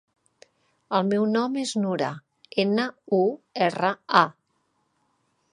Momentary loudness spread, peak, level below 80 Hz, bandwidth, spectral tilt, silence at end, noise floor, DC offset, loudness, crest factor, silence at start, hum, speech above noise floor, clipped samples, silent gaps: 7 LU; -2 dBFS; -76 dBFS; 11 kHz; -5.5 dB/octave; 1.2 s; -72 dBFS; under 0.1%; -24 LUFS; 24 dB; 0.9 s; none; 48 dB; under 0.1%; none